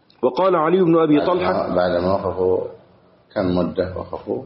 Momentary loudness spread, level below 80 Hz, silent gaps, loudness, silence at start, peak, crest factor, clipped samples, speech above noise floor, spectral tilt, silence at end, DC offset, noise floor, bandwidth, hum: 11 LU; -50 dBFS; none; -19 LUFS; 0.2 s; -6 dBFS; 14 dB; under 0.1%; 34 dB; -6 dB/octave; 0 s; under 0.1%; -52 dBFS; 5.8 kHz; none